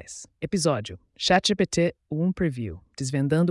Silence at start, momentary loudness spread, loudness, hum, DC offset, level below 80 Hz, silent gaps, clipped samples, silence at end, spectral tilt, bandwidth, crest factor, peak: 0.1 s; 15 LU; -25 LUFS; none; under 0.1%; -52 dBFS; none; under 0.1%; 0 s; -5 dB/octave; 12 kHz; 16 dB; -10 dBFS